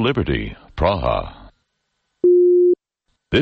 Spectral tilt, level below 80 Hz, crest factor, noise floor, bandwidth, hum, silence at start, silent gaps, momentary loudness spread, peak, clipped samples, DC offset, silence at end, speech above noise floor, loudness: -8.5 dB/octave; -34 dBFS; 16 dB; -73 dBFS; 5 kHz; none; 0 s; none; 12 LU; -4 dBFS; under 0.1%; under 0.1%; 0 s; 53 dB; -18 LUFS